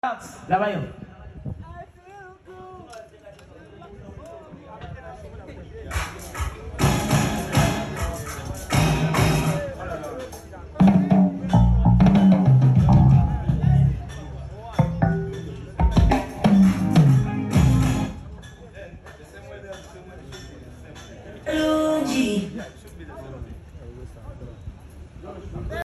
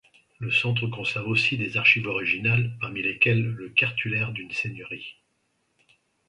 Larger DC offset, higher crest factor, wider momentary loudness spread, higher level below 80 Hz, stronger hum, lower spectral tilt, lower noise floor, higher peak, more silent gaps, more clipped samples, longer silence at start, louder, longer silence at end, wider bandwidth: neither; second, 16 dB vs 22 dB; first, 25 LU vs 13 LU; first, -32 dBFS vs -60 dBFS; neither; first, -7 dB/octave vs -5.5 dB/octave; second, -46 dBFS vs -72 dBFS; second, -8 dBFS vs -4 dBFS; neither; neither; second, 0.05 s vs 0.4 s; first, -20 LUFS vs -23 LUFS; second, 0 s vs 1.15 s; first, 13 kHz vs 10.5 kHz